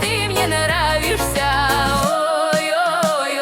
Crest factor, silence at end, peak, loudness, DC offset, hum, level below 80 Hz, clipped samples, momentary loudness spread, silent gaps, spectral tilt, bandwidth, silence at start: 14 dB; 0 s; -4 dBFS; -17 LUFS; under 0.1%; none; -32 dBFS; under 0.1%; 2 LU; none; -3.5 dB/octave; 17.5 kHz; 0 s